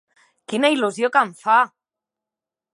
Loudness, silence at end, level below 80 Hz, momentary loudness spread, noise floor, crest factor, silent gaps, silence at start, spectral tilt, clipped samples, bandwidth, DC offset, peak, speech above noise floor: -19 LUFS; 1.1 s; -80 dBFS; 6 LU; -88 dBFS; 20 dB; none; 0.5 s; -3.5 dB/octave; under 0.1%; 11.5 kHz; under 0.1%; -2 dBFS; 70 dB